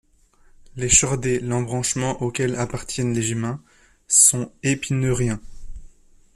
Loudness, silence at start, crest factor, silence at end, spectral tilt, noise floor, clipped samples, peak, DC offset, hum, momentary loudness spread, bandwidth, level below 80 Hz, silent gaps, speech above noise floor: -20 LUFS; 0.75 s; 22 dB; 0.5 s; -3.5 dB/octave; -55 dBFS; under 0.1%; 0 dBFS; under 0.1%; none; 13 LU; 14 kHz; -42 dBFS; none; 34 dB